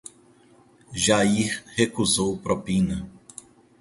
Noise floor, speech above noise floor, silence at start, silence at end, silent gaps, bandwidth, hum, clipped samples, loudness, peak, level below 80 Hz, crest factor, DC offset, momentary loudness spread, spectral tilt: -56 dBFS; 32 dB; 0.9 s; 0.65 s; none; 11.5 kHz; none; under 0.1%; -23 LUFS; -4 dBFS; -48 dBFS; 22 dB; under 0.1%; 23 LU; -4 dB/octave